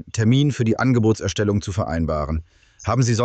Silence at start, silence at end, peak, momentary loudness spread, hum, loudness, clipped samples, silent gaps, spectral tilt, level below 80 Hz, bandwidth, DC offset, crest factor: 0.05 s; 0 s; -6 dBFS; 8 LU; none; -21 LUFS; under 0.1%; none; -6 dB/octave; -36 dBFS; 8.8 kHz; under 0.1%; 14 dB